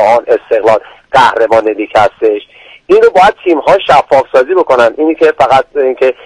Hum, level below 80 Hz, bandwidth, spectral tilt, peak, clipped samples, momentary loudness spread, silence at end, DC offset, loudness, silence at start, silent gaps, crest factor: none; -44 dBFS; 11 kHz; -5 dB/octave; 0 dBFS; 1%; 5 LU; 0.15 s; under 0.1%; -9 LUFS; 0 s; none; 8 dB